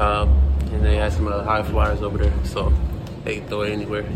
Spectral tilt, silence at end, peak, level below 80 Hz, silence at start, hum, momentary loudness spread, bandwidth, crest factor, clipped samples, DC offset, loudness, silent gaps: -7 dB/octave; 0 s; -4 dBFS; -22 dBFS; 0 s; none; 8 LU; 9.4 kHz; 14 dB; under 0.1%; under 0.1%; -22 LUFS; none